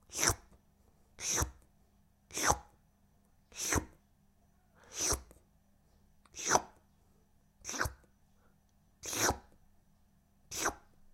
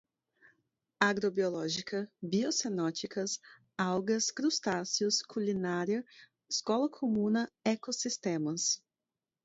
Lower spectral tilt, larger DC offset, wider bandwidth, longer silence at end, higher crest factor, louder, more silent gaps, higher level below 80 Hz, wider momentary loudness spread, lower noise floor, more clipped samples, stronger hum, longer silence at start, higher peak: second, -2 dB/octave vs -3.5 dB/octave; neither; first, 16.5 kHz vs 8 kHz; second, 0.35 s vs 0.7 s; first, 32 dB vs 22 dB; about the same, -35 LUFS vs -33 LUFS; neither; first, -54 dBFS vs -76 dBFS; first, 15 LU vs 6 LU; second, -69 dBFS vs under -90 dBFS; neither; neither; second, 0.1 s vs 1 s; first, -8 dBFS vs -12 dBFS